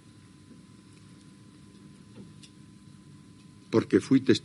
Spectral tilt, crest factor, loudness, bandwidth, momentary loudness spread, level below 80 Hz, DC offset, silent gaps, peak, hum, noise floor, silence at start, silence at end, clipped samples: -6 dB/octave; 22 dB; -25 LUFS; 11.5 kHz; 29 LU; -70 dBFS; under 0.1%; none; -8 dBFS; none; -53 dBFS; 2.2 s; 0.05 s; under 0.1%